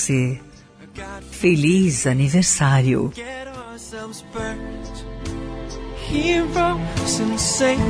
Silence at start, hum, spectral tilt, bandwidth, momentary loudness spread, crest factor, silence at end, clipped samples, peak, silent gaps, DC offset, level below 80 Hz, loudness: 0 s; none; -4.5 dB/octave; 11 kHz; 18 LU; 16 dB; 0 s; under 0.1%; -4 dBFS; none; under 0.1%; -38 dBFS; -19 LUFS